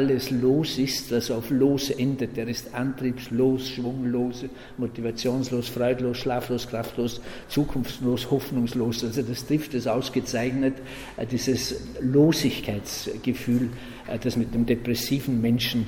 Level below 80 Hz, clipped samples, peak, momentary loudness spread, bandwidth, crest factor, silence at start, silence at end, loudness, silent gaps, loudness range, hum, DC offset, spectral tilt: -48 dBFS; under 0.1%; -8 dBFS; 8 LU; 17.5 kHz; 16 dB; 0 s; 0 s; -26 LUFS; none; 3 LU; none; under 0.1%; -5.5 dB/octave